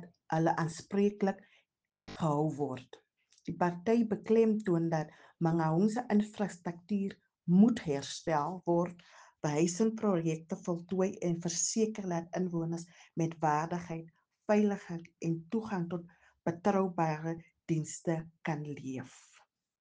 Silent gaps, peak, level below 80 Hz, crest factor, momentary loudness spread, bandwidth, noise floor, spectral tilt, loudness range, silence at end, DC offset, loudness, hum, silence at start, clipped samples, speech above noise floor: none; -14 dBFS; -72 dBFS; 20 dB; 13 LU; 10 kHz; -67 dBFS; -6 dB/octave; 4 LU; 0.7 s; under 0.1%; -33 LUFS; none; 0 s; under 0.1%; 35 dB